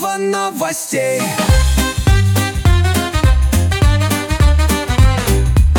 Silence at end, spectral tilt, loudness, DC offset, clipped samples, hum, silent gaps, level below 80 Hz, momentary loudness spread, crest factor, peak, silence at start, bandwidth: 0 s; -5 dB/octave; -14 LUFS; under 0.1%; under 0.1%; none; none; -16 dBFS; 5 LU; 12 dB; -2 dBFS; 0 s; 18 kHz